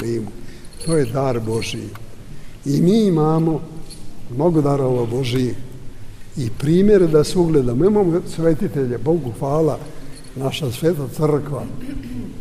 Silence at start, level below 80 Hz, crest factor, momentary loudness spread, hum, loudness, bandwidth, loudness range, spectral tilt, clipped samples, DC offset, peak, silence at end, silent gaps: 0 s; -36 dBFS; 16 dB; 20 LU; none; -19 LUFS; 15.5 kHz; 5 LU; -7 dB/octave; under 0.1%; under 0.1%; -2 dBFS; 0 s; none